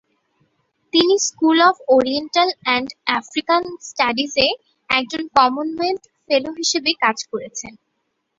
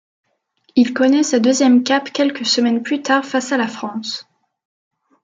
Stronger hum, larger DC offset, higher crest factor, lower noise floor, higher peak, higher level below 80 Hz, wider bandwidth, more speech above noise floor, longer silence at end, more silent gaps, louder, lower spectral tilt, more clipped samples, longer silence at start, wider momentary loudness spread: neither; neither; about the same, 20 dB vs 16 dB; first, -72 dBFS vs -61 dBFS; about the same, 0 dBFS vs -2 dBFS; first, -58 dBFS vs -68 dBFS; second, 7.8 kHz vs 9.2 kHz; first, 54 dB vs 45 dB; second, 0.65 s vs 1 s; neither; about the same, -18 LUFS vs -16 LUFS; second, -1.5 dB/octave vs -3 dB/octave; neither; first, 0.95 s vs 0.75 s; about the same, 13 LU vs 11 LU